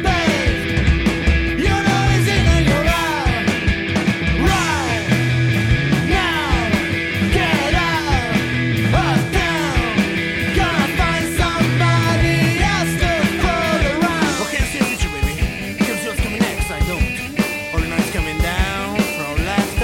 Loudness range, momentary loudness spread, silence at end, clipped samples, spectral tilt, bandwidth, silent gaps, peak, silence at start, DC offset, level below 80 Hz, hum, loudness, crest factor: 4 LU; 5 LU; 0 s; under 0.1%; -5 dB/octave; 17 kHz; none; -4 dBFS; 0 s; under 0.1%; -24 dBFS; none; -17 LUFS; 12 dB